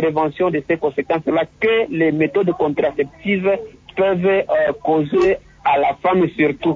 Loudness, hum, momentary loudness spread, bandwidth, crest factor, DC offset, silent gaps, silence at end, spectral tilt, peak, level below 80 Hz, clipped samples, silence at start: -18 LUFS; none; 4 LU; 7.4 kHz; 14 dB; under 0.1%; none; 0 s; -8 dB/octave; -4 dBFS; -50 dBFS; under 0.1%; 0 s